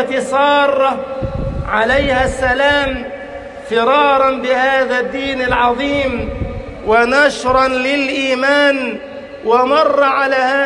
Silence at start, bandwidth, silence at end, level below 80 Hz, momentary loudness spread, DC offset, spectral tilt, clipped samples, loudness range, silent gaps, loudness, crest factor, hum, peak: 0 s; 11 kHz; 0 s; -34 dBFS; 12 LU; under 0.1%; -4.5 dB/octave; under 0.1%; 1 LU; none; -14 LUFS; 14 dB; none; -2 dBFS